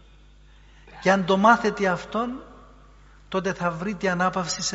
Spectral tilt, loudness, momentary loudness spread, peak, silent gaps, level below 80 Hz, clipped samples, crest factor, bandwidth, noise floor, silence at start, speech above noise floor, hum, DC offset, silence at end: -4 dB/octave; -23 LUFS; 11 LU; -4 dBFS; none; -52 dBFS; under 0.1%; 22 dB; 8 kHz; -51 dBFS; 0.85 s; 28 dB; none; under 0.1%; 0 s